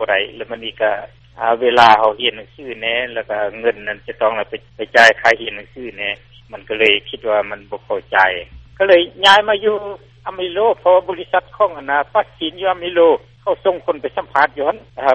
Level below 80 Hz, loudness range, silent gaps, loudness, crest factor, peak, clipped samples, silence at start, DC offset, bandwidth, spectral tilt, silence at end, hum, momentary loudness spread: -50 dBFS; 3 LU; none; -16 LUFS; 16 dB; 0 dBFS; under 0.1%; 0 s; under 0.1%; 8.4 kHz; -3 dB/octave; 0 s; none; 17 LU